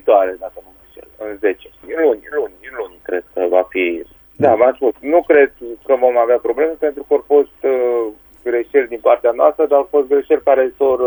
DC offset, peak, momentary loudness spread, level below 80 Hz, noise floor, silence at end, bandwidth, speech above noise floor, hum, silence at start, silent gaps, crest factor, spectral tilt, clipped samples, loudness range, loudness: under 0.1%; 0 dBFS; 15 LU; -52 dBFS; -42 dBFS; 0 s; over 20 kHz; 27 dB; none; 0.05 s; none; 16 dB; -7.5 dB/octave; under 0.1%; 5 LU; -16 LUFS